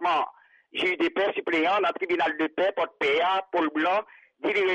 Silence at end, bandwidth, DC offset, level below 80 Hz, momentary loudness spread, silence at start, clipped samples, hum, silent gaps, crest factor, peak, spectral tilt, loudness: 0 s; 9.2 kHz; under 0.1%; -70 dBFS; 4 LU; 0 s; under 0.1%; none; none; 10 dB; -16 dBFS; -4.5 dB/octave; -26 LUFS